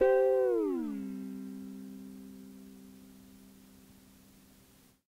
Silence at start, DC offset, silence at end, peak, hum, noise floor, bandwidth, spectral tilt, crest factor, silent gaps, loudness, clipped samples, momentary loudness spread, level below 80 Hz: 0 s; under 0.1%; 2 s; -16 dBFS; none; -62 dBFS; 16 kHz; -7 dB/octave; 18 dB; none; -32 LUFS; under 0.1%; 28 LU; -66 dBFS